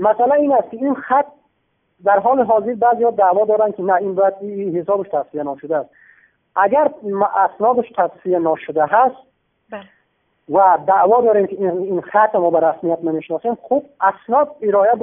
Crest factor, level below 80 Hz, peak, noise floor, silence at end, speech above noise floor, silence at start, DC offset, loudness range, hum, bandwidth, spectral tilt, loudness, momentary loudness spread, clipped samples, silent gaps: 16 dB; -64 dBFS; -2 dBFS; -67 dBFS; 0 s; 51 dB; 0 s; under 0.1%; 4 LU; none; 3.6 kHz; -11.5 dB/octave; -17 LUFS; 9 LU; under 0.1%; none